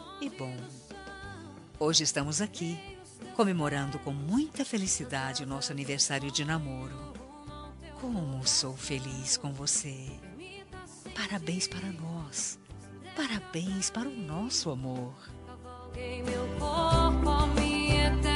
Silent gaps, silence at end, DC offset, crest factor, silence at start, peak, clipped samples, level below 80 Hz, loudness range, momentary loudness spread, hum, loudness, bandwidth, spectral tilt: none; 0 s; under 0.1%; 22 dB; 0 s; -10 dBFS; under 0.1%; -40 dBFS; 4 LU; 19 LU; none; -31 LUFS; 11.5 kHz; -3.5 dB/octave